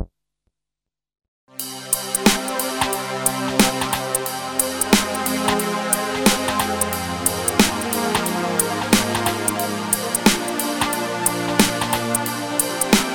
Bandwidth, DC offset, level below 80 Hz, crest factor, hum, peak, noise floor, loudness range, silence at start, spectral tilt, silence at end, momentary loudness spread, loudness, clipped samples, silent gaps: over 20 kHz; under 0.1%; -46 dBFS; 22 dB; none; 0 dBFS; -87 dBFS; 2 LU; 0 s; -2.5 dB/octave; 0 s; 5 LU; -20 LUFS; under 0.1%; 1.28-1.47 s